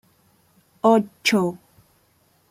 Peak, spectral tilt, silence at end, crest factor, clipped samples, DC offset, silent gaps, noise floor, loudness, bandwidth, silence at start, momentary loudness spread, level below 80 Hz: -4 dBFS; -4.5 dB/octave; 0.95 s; 20 dB; under 0.1%; under 0.1%; none; -62 dBFS; -20 LUFS; 16.5 kHz; 0.85 s; 9 LU; -68 dBFS